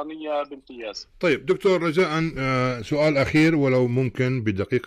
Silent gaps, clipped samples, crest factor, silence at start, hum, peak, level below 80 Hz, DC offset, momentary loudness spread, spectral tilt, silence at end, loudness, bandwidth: none; under 0.1%; 12 dB; 0 s; none; -12 dBFS; -50 dBFS; under 0.1%; 13 LU; -7 dB/octave; 0.05 s; -22 LUFS; 13 kHz